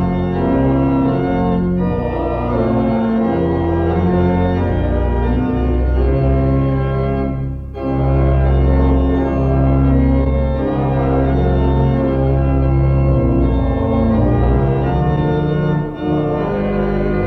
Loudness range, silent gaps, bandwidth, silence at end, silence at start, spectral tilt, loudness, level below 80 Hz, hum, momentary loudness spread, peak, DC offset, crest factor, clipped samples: 2 LU; none; 4.6 kHz; 0 s; 0 s; -11 dB/octave; -16 LUFS; -20 dBFS; none; 4 LU; -2 dBFS; under 0.1%; 12 dB; under 0.1%